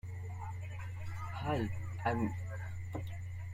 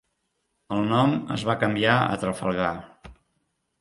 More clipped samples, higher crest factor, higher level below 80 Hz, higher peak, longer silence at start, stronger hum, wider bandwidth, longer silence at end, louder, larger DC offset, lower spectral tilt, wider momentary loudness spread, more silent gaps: neither; about the same, 18 dB vs 22 dB; about the same, -56 dBFS vs -54 dBFS; second, -20 dBFS vs -4 dBFS; second, 0.05 s vs 0.7 s; neither; first, 15 kHz vs 11.5 kHz; second, 0 s vs 0.7 s; second, -40 LUFS vs -24 LUFS; neither; first, -7.5 dB/octave vs -6 dB/octave; about the same, 8 LU vs 8 LU; neither